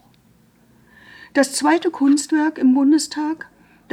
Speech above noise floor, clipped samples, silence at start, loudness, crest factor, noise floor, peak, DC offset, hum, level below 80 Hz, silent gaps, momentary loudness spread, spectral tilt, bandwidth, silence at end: 38 dB; under 0.1%; 1.35 s; -18 LUFS; 16 dB; -55 dBFS; -4 dBFS; under 0.1%; none; -66 dBFS; none; 10 LU; -2.5 dB/octave; 13 kHz; 0.55 s